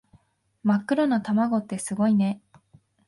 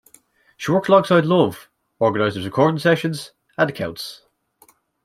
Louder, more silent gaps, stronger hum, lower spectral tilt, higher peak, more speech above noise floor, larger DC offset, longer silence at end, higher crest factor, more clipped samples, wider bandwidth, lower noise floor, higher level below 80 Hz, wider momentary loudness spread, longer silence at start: second, -24 LUFS vs -19 LUFS; neither; neither; about the same, -6.5 dB/octave vs -6.5 dB/octave; second, -10 dBFS vs -2 dBFS; about the same, 39 dB vs 38 dB; neither; second, 0.7 s vs 0.9 s; about the same, 16 dB vs 18 dB; neither; second, 11.5 kHz vs 16 kHz; first, -62 dBFS vs -56 dBFS; second, -68 dBFS vs -60 dBFS; second, 7 LU vs 17 LU; about the same, 0.65 s vs 0.6 s